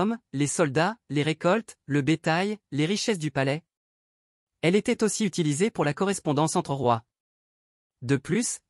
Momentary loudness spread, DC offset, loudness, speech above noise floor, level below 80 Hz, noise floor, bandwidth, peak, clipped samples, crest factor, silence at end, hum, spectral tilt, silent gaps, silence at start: 4 LU; under 0.1%; -26 LUFS; over 64 dB; -64 dBFS; under -90 dBFS; 13.5 kHz; -8 dBFS; under 0.1%; 18 dB; 0.1 s; none; -5 dB/octave; 3.77-4.47 s, 7.20-7.90 s; 0 s